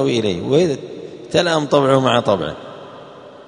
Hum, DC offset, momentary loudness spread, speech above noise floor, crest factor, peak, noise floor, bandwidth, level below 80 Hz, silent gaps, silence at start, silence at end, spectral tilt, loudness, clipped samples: none; under 0.1%; 21 LU; 22 dB; 18 dB; 0 dBFS; -38 dBFS; 10.5 kHz; -54 dBFS; none; 0 s; 0.05 s; -5.5 dB/octave; -17 LUFS; under 0.1%